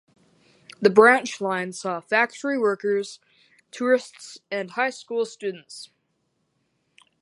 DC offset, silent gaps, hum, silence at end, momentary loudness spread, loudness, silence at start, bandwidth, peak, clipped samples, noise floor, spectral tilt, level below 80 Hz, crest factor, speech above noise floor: under 0.1%; none; none; 1.35 s; 23 LU; -23 LUFS; 0.8 s; 11.5 kHz; -2 dBFS; under 0.1%; -73 dBFS; -4 dB/octave; -76 dBFS; 24 dB; 50 dB